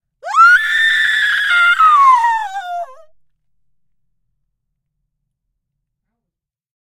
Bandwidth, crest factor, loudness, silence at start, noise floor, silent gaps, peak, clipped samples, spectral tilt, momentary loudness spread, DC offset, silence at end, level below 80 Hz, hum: 16.5 kHz; 16 dB; -10 LUFS; 0.25 s; -82 dBFS; none; 0 dBFS; under 0.1%; 2.5 dB/octave; 15 LU; under 0.1%; 4 s; -60 dBFS; none